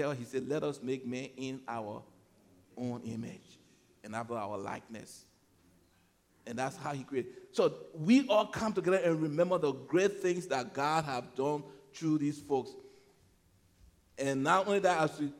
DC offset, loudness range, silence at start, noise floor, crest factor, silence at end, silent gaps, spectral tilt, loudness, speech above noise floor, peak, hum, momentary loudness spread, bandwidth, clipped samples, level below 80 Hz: under 0.1%; 12 LU; 0 s; -69 dBFS; 22 dB; 0 s; none; -5.5 dB/octave; -33 LUFS; 36 dB; -12 dBFS; none; 16 LU; 15.5 kHz; under 0.1%; -72 dBFS